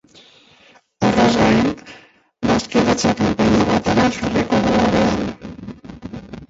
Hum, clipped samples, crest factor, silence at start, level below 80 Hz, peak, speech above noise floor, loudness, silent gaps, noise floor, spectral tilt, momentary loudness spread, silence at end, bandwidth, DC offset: none; under 0.1%; 16 dB; 1 s; -40 dBFS; -2 dBFS; 35 dB; -17 LUFS; none; -51 dBFS; -5.5 dB/octave; 19 LU; 0.05 s; 8 kHz; under 0.1%